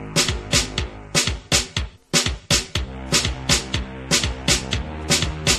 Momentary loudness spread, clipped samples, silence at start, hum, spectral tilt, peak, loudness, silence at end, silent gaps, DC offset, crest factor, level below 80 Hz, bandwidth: 8 LU; under 0.1%; 0 s; none; -2.5 dB/octave; -2 dBFS; -21 LUFS; 0 s; none; under 0.1%; 22 dB; -32 dBFS; 13.5 kHz